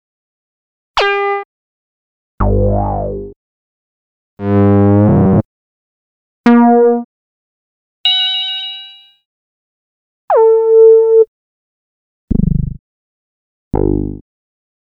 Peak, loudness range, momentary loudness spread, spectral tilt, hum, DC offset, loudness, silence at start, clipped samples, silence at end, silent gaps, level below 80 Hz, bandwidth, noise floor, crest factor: 0 dBFS; 7 LU; 15 LU; -8 dB/octave; 50 Hz at -30 dBFS; under 0.1%; -12 LUFS; 0.95 s; under 0.1%; 0.75 s; 1.45-2.38 s, 3.36-4.37 s, 5.45-6.44 s, 7.05-8.04 s, 9.25-10.28 s, 11.28-12.28 s, 12.79-13.71 s; -28 dBFS; 6.6 kHz; -36 dBFS; 14 dB